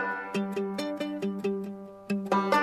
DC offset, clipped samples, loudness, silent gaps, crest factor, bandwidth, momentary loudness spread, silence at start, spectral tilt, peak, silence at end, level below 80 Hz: under 0.1%; under 0.1%; -31 LUFS; none; 18 dB; 14 kHz; 8 LU; 0 s; -6 dB/octave; -12 dBFS; 0 s; -72 dBFS